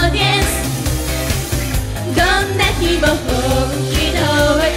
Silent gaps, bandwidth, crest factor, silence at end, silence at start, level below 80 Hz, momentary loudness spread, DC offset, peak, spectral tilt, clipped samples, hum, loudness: none; 16.5 kHz; 12 dB; 0 s; 0 s; -24 dBFS; 6 LU; under 0.1%; -2 dBFS; -4 dB/octave; under 0.1%; none; -16 LUFS